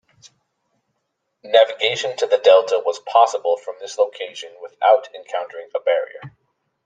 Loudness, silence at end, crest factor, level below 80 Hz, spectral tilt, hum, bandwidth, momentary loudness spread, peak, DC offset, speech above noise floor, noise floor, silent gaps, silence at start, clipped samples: -18 LUFS; 0.55 s; 18 dB; -72 dBFS; -1.5 dB/octave; none; 9.2 kHz; 17 LU; -2 dBFS; under 0.1%; 56 dB; -74 dBFS; none; 1.45 s; under 0.1%